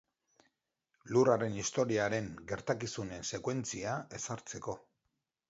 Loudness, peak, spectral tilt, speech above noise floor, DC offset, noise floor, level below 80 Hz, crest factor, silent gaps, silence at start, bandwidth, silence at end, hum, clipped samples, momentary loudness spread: -35 LUFS; -14 dBFS; -5 dB/octave; 50 dB; under 0.1%; -85 dBFS; -66 dBFS; 22 dB; none; 1.05 s; 8 kHz; 0.7 s; none; under 0.1%; 12 LU